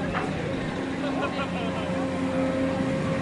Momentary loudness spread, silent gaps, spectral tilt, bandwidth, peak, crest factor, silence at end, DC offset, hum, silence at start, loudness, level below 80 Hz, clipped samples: 3 LU; none; -6.5 dB/octave; 11.5 kHz; -14 dBFS; 14 dB; 0 s; under 0.1%; none; 0 s; -28 LUFS; -50 dBFS; under 0.1%